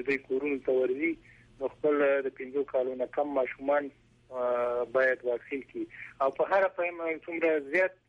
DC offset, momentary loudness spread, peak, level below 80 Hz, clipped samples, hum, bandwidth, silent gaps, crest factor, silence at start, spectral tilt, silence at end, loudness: under 0.1%; 11 LU; -16 dBFS; -68 dBFS; under 0.1%; none; 7.6 kHz; none; 14 dB; 0 s; -6.5 dB/octave; 0.15 s; -30 LUFS